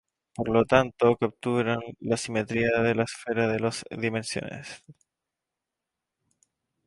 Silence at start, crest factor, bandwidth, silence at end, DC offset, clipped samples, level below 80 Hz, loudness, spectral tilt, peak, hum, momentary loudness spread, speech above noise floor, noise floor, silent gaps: 0.4 s; 24 dB; 11.5 kHz; 1.95 s; under 0.1%; under 0.1%; -58 dBFS; -26 LUFS; -5.5 dB/octave; -4 dBFS; none; 13 LU; 61 dB; -87 dBFS; none